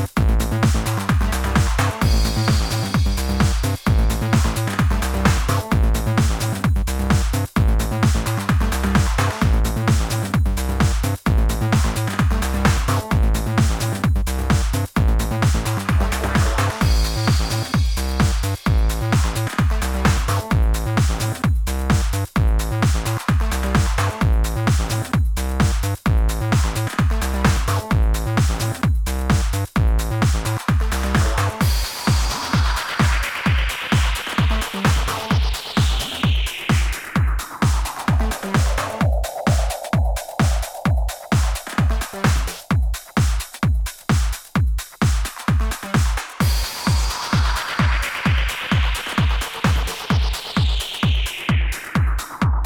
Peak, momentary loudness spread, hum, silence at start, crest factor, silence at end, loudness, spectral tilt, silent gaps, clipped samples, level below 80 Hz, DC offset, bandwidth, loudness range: -2 dBFS; 3 LU; none; 0 s; 16 dB; 0 s; -20 LUFS; -5 dB/octave; none; under 0.1%; -22 dBFS; under 0.1%; 19 kHz; 2 LU